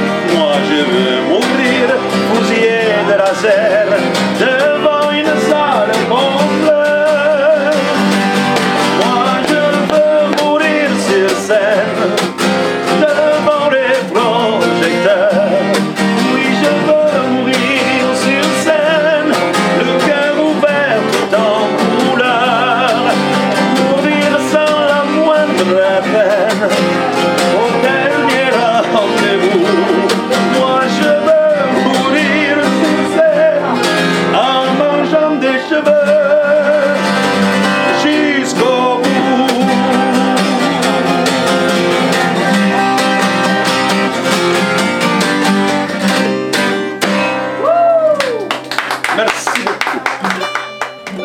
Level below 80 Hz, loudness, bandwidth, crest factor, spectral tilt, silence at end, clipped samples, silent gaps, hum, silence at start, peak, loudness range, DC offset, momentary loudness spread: -60 dBFS; -12 LUFS; 17 kHz; 12 dB; -4.5 dB/octave; 0 s; under 0.1%; none; none; 0 s; 0 dBFS; 1 LU; under 0.1%; 3 LU